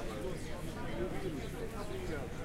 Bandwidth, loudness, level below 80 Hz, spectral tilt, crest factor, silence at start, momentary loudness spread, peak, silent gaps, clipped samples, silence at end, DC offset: 16 kHz; -41 LUFS; -46 dBFS; -6 dB/octave; 12 dB; 0 s; 3 LU; -26 dBFS; none; under 0.1%; 0 s; under 0.1%